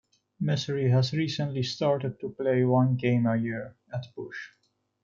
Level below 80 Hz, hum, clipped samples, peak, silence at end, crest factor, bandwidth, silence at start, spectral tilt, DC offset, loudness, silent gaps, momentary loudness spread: -68 dBFS; none; under 0.1%; -12 dBFS; 0.55 s; 16 dB; 7.4 kHz; 0.4 s; -7 dB/octave; under 0.1%; -27 LUFS; none; 15 LU